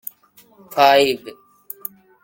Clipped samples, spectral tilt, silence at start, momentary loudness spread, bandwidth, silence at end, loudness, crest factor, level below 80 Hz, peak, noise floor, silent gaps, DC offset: under 0.1%; -3 dB/octave; 0.7 s; 22 LU; 17 kHz; 0.95 s; -16 LUFS; 18 dB; -64 dBFS; -2 dBFS; -52 dBFS; none; under 0.1%